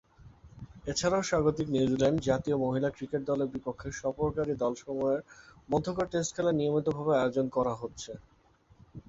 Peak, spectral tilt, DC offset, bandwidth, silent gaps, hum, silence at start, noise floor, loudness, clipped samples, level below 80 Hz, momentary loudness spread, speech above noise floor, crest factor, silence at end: -12 dBFS; -5.5 dB/octave; under 0.1%; 8 kHz; none; none; 0.2 s; -63 dBFS; -30 LUFS; under 0.1%; -54 dBFS; 11 LU; 33 dB; 18 dB; 0.1 s